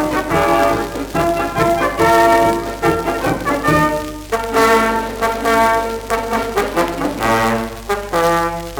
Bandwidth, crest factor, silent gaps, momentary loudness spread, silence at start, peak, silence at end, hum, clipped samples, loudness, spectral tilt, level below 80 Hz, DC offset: over 20 kHz; 16 dB; none; 8 LU; 0 s; 0 dBFS; 0 s; none; under 0.1%; -16 LUFS; -4.5 dB/octave; -34 dBFS; under 0.1%